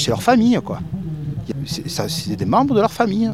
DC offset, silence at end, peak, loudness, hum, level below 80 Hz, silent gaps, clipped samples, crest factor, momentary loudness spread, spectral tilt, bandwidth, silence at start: 0.4%; 0 s; -2 dBFS; -19 LUFS; none; -46 dBFS; none; under 0.1%; 18 dB; 12 LU; -5.5 dB/octave; 15.5 kHz; 0 s